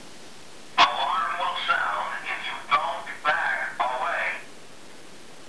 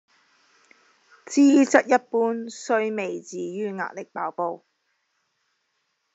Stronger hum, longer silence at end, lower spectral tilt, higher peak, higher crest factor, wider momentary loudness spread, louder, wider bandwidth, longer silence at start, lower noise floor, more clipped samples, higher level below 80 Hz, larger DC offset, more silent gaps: neither; second, 0 s vs 1.6 s; second, -1 dB/octave vs -4.5 dB/octave; about the same, -4 dBFS vs -2 dBFS; about the same, 22 dB vs 22 dB; first, 25 LU vs 15 LU; about the same, -25 LUFS vs -23 LUFS; first, 11 kHz vs 8 kHz; second, 0 s vs 1.3 s; second, -47 dBFS vs -74 dBFS; neither; first, -72 dBFS vs -80 dBFS; first, 0.8% vs under 0.1%; neither